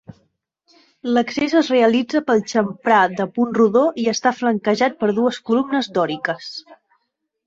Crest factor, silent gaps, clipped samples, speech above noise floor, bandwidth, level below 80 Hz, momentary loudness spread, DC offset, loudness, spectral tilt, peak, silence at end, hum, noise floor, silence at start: 18 dB; none; under 0.1%; 55 dB; 7.8 kHz; -62 dBFS; 7 LU; under 0.1%; -18 LUFS; -5 dB/octave; -2 dBFS; 0.7 s; none; -73 dBFS; 0.1 s